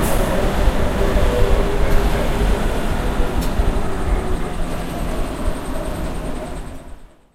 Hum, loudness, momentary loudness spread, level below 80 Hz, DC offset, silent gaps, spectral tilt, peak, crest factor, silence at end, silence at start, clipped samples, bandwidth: none; -22 LUFS; 9 LU; -20 dBFS; under 0.1%; none; -6 dB/octave; -2 dBFS; 16 dB; 0.3 s; 0 s; under 0.1%; 16 kHz